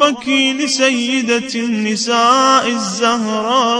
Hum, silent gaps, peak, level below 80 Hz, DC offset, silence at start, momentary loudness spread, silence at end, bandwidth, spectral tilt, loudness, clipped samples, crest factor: none; none; 0 dBFS; -62 dBFS; under 0.1%; 0 s; 7 LU; 0 s; 10.5 kHz; -2.5 dB/octave; -14 LUFS; under 0.1%; 14 dB